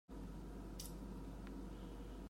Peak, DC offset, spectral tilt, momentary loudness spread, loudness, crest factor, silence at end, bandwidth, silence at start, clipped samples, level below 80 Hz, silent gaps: -34 dBFS; under 0.1%; -5.5 dB/octave; 2 LU; -52 LUFS; 16 dB; 0 s; 16 kHz; 0.1 s; under 0.1%; -54 dBFS; none